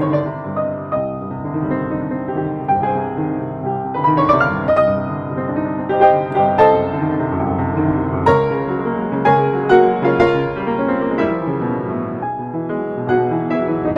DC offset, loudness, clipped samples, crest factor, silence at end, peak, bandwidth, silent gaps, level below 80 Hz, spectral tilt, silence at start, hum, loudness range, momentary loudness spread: under 0.1%; -18 LUFS; under 0.1%; 16 dB; 0 s; 0 dBFS; 7.4 kHz; none; -46 dBFS; -9 dB/octave; 0 s; none; 5 LU; 9 LU